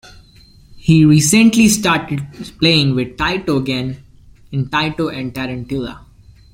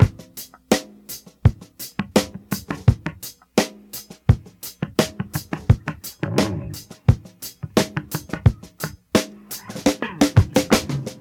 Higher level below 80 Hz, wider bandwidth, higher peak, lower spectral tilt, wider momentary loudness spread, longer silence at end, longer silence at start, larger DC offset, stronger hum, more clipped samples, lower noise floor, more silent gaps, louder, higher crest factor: second, -42 dBFS vs -36 dBFS; second, 16.5 kHz vs 19 kHz; about the same, 0 dBFS vs 0 dBFS; about the same, -4.5 dB/octave vs -5.5 dB/octave; about the same, 15 LU vs 16 LU; first, 0.55 s vs 0.05 s; first, 0.75 s vs 0 s; neither; neither; neither; first, -45 dBFS vs -41 dBFS; neither; first, -15 LUFS vs -22 LUFS; second, 16 dB vs 22 dB